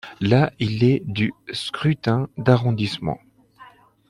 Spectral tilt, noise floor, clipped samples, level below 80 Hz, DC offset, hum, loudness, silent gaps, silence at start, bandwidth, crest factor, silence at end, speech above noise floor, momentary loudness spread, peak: -7.5 dB/octave; -49 dBFS; under 0.1%; -54 dBFS; under 0.1%; none; -21 LUFS; none; 0.05 s; 11.5 kHz; 18 dB; 0.45 s; 29 dB; 9 LU; -4 dBFS